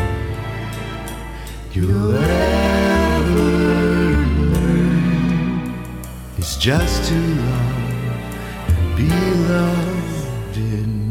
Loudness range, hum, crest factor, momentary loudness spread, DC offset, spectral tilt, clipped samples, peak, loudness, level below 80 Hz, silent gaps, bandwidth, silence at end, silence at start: 4 LU; none; 14 dB; 12 LU; under 0.1%; -6.5 dB/octave; under 0.1%; -2 dBFS; -18 LUFS; -26 dBFS; none; 16.5 kHz; 0 s; 0 s